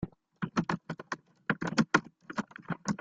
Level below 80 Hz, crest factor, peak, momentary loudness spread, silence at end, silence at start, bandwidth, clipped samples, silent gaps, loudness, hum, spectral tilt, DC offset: -64 dBFS; 26 dB; -8 dBFS; 12 LU; 0.05 s; 0 s; 9.2 kHz; under 0.1%; none; -34 LUFS; none; -5 dB/octave; under 0.1%